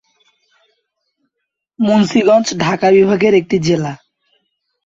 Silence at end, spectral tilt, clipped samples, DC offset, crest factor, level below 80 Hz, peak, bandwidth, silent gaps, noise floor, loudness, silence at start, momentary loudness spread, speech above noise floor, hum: 0.9 s; -5.5 dB/octave; under 0.1%; under 0.1%; 14 dB; -54 dBFS; -2 dBFS; 7.8 kHz; none; -76 dBFS; -13 LUFS; 1.8 s; 8 LU; 64 dB; none